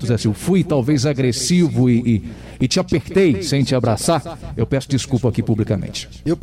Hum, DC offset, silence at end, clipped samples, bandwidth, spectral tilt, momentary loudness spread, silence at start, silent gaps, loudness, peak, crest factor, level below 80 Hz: none; under 0.1%; 0.05 s; under 0.1%; 15 kHz; -6 dB/octave; 7 LU; 0 s; none; -18 LUFS; -6 dBFS; 12 dB; -40 dBFS